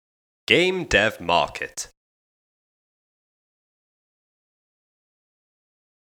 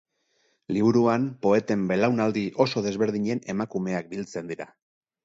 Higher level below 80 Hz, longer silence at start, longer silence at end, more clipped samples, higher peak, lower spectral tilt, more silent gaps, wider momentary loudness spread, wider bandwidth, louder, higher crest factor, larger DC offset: first, -48 dBFS vs -64 dBFS; second, 0.5 s vs 0.7 s; first, 4.2 s vs 0.6 s; neither; first, 0 dBFS vs -6 dBFS; second, -3.5 dB/octave vs -6.5 dB/octave; neither; first, 17 LU vs 12 LU; first, 18.5 kHz vs 7.8 kHz; first, -20 LUFS vs -25 LUFS; first, 28 dB vs 20 dB; neither